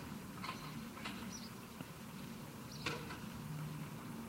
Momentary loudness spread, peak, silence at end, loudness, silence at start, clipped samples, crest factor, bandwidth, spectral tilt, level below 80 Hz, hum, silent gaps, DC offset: 7 LU; -26 dBFS; 0 s; -47 LUFS; 0 s; under 0.1%; 22 dB; 16 kHz; -4.5 dB/octave; -66 dBFS; none; none; under 0.1%